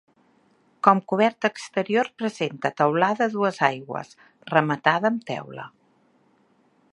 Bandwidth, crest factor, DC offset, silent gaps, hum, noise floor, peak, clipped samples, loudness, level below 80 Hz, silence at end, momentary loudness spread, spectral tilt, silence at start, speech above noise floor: 11 kHz; 24 dB; under 0.1%; none; none; -63 dBFS; -2 dBFS; under 0.1%; -23 LUFS; -74 dBFS; 1.25 s; 14 LU; -6 dB/octave; 0.85 s; 39 dB